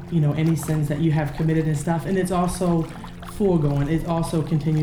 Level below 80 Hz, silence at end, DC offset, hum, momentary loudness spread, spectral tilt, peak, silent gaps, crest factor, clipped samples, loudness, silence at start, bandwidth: -40 dBFS; 0 s; under 0.1%; none; 4 LU; -7.5 dB/octave; -8 dBFS; none; 14 dB; under 0.1%; -22 LUFS; 0 s; 14.5 kHz